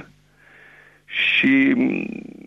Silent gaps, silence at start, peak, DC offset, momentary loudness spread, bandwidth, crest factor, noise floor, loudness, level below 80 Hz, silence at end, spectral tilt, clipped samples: none; 0 s; -8 dBFS; under 0.1%; 13 LU; 6 kHz; 14 dB; -52 dBFS; -18 LUFS; -62 dBFS; 0.2 s; -6 dB/octave; under 0.1%